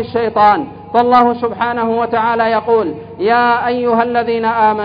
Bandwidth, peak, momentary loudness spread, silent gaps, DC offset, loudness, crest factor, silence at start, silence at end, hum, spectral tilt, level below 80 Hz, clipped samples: 5.2 kHz; 0 dBFS; 6 LU; none; under 0.1%; -14 LUFS; 14 dB; 0 s; 0 s; 50 Hz at -40 dBFS; -8 dB/octave; -48 dBFS; under 0.1%